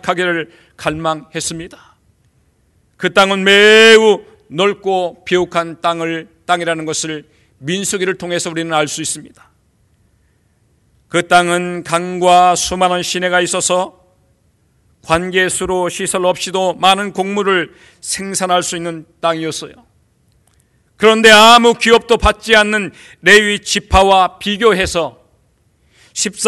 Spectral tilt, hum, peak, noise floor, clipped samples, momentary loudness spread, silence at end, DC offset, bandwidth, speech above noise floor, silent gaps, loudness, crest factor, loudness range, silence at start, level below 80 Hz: -3 dB/octave; none; 0 dBFS; -57 dBFS; 0.3%; 14 LU; 0 s; under 0.1%; 13.5 kHz; 44 dB; none; -13 LUFS; 14 dB; 9 LU; 0.05 s; -36 dBFS